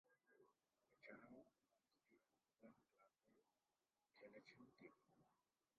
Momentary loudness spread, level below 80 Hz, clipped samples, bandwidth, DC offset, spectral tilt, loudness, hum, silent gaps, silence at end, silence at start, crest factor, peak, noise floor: 5 LU; under -90 dBFS; under 0.1%; 4.6 kHz; under 0.1%; -4 dB/octave; -67 LUFS; none; none; 0.15 s; 0.05 s; 26 dB; -48 dBFS; under -90 dBFS